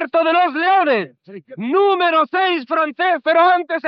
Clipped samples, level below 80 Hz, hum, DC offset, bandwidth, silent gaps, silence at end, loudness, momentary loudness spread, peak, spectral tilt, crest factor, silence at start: under 0.1%; -80 dBFS; none; under 0.1%; 5.6 kHz; none; 0 s; -16 LUFS; 7 LU; -4 dBFS; -1 dB/octave; 12 dB; 0 s